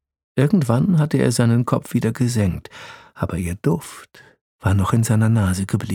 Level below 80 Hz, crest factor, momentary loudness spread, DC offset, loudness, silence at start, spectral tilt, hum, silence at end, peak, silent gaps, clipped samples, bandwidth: -44 dBFS; 18 dB; 14 LU; under 0.1%; -19 LUFS; 0.35 s; -7 dB/octave; none; 0 s; -2 dBFS; 4.41-4.59 s; under 0.1%; 16.5 kHz